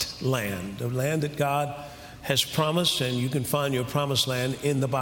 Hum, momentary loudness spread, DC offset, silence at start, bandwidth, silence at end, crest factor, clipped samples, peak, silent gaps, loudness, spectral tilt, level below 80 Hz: none; 9 LU; under 0.1%; 0 s; 17 kHz; 0 s; 18 dB; under 0.1%; -8 dBFS; none; -26 LUFS; -4.5 dB/octave; -56 dBFS